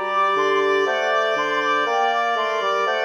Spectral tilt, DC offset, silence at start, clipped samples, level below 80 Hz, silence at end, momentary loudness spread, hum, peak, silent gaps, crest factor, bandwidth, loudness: -2 dB/octave; under 0.1%; 0 s; under 0.1%; under -90 dBFS; 0 s; 2 LU; none; -8 dBFS; none; 12 dB; 12.5 kHz; -20 LUFS